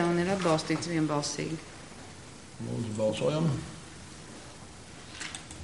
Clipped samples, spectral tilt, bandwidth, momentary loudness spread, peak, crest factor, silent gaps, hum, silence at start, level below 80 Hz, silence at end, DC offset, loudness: under 0.1%; -5 dB/octave; 11.5 kHz; 19 LU; -12 dBFS; 20 dB; none; none; 0 s; -58 dBFS; 0 s; 0.2%; -31 LUFS